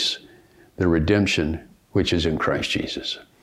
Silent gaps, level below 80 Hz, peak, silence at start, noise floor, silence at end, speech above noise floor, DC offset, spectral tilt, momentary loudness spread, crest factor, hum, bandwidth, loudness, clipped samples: none; -42 dBFS; -6 dBFS; 0 s; -52 dBFS; 0.2 s; 30 dB; under 0.1%; -5 dB/octave; 10 LU; 18 dB; none; 14.5 kHz; -23 LUFS; under 0.1%